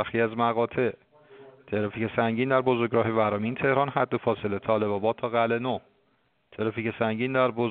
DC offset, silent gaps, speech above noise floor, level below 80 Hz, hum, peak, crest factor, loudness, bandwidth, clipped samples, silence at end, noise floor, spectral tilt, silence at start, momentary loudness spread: under 0.1%; none; 44 dB; -64 dBFS; none; -8 dBFS; 18 dB; -26 LUFS; 4.6 kHz; under 0.1%; 0 s; -69 dBFS; -5 dB/octave; 0 s; 6 LU